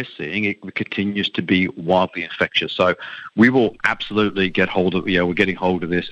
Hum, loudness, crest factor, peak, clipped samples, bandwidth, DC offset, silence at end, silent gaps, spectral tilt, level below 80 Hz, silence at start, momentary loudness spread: none; -19 LUFS; 16 dB; -2 dBFS; under 0.1%; 8.6 kHz; under 0.1%; 0 s; none; -6.5 dB/octave; -54 dBFS; 0 s; 7 LU